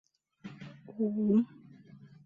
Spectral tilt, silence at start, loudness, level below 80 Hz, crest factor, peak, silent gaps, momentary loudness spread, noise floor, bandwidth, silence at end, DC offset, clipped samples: -10 dB/octave; 0.45 s; -31 LUFS; -76 dBFS; 16 dB; -18 dBFS; none; 22 LU; -55 dBFS; 4.8 kHz; 0.3 s; under 0.1%; under 0.1%